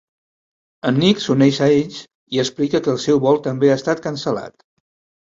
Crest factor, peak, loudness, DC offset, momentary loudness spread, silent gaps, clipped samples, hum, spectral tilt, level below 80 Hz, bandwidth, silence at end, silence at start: 16 dB; -2 dBFS; -18 LUFS; under 0.1%; 10 LU; 2.15-2.27 s; under 0.1%; none; -6 dB/octave; -58 dBFS; 7.8 kHz; 0.75 s; 0.85 s